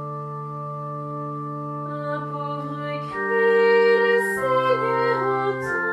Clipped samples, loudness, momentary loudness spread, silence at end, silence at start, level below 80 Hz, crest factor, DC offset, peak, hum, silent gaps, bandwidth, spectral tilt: under 0.1%; -23 LUFS; 14 LU; 0 s; 0 s; -64 dBFS; 16 dB; under 0.1%; -8 dBFS; none; none; 13 kHz; -6 dB/octave